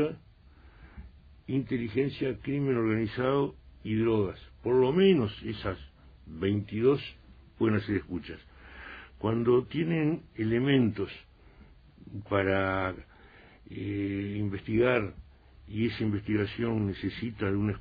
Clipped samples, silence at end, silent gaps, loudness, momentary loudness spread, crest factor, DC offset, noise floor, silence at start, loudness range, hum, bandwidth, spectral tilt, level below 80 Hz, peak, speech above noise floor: under 0.1%; 0 s; none; -29 LUFS; 18 LU; 18 dB; under 0.1%; -55 dBFS; 0 s; 4 LU; none; 5 kHz; -10 dB/octave; -54 dBFS; -12 dBFS; 27 dB